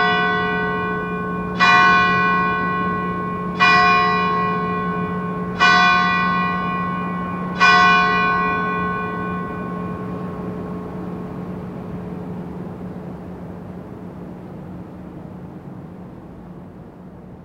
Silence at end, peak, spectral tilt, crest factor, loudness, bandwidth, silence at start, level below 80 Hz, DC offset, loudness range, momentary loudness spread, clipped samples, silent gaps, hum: 0 s; 0 dBFS; -5 dB/octave; 20 dB; -18 LUFS; 8.8 kHz; 0 s; -46 dBFS; under 0.1%; 19 LU; 23 LU; under 0.1%; none; none